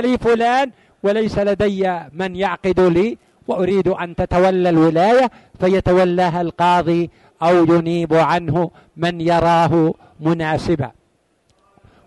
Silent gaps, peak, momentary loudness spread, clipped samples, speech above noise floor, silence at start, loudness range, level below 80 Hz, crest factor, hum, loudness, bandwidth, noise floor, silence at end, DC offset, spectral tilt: none; -4 dBFS; 9 LU; under 0.1%; 46 dB; 0 s; 3 LU; -42 dBFS; 12 dB; none; -17 LUFS; 11.5 kHz; -62 dBFS; 1.15 s; under 0.1%; -7 dB/octave